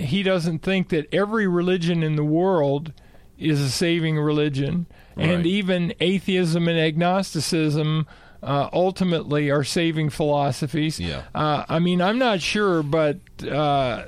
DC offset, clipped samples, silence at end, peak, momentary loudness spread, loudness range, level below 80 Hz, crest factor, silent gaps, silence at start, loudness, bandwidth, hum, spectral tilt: under 0.1%; under 0.1%; 0 s; -8 dBFS; 6 LU; 1 LU; -48 dBFS; 14 dB; none; 0 s; -22 LUFS; 14 kHz; none; -6 dB/octave